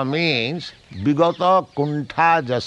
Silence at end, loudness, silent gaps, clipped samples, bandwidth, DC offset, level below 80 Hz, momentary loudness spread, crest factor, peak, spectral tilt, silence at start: 0 s; -19 LUFS; none; under 0.1%; 9.4 kHz; under 0.1%; -60 dBFS; 9 LU; 16 dB; -2 dBFS; -6.5 dB/octave; 0 s